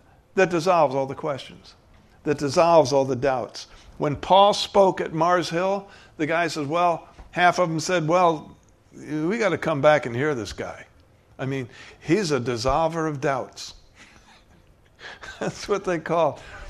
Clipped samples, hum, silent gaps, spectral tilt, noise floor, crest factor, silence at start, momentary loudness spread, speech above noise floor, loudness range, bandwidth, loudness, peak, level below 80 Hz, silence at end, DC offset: under 0.1%; none; none; -5 dB/octave; -55 dBFS; 20 dB; 0.35 s; 17 LU; 32 dB; 7 LU; 13.5 kHz; -23 LUFS; -4 dBFS; -50 dBFS; 0 s; under 0.1%